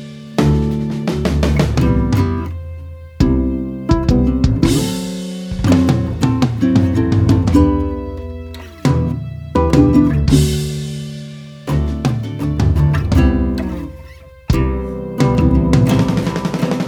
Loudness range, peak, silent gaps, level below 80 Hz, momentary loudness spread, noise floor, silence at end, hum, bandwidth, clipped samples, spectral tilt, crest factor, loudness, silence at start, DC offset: 2 LU; 0 dBFS; none; -24 dBFS; 14 LU; -37 dBFS; 0 s; none; 17.5 kHz; under 0.1%; -7 dB/octave; 16 dB; -16 LUFS; 0 s; under 0.1%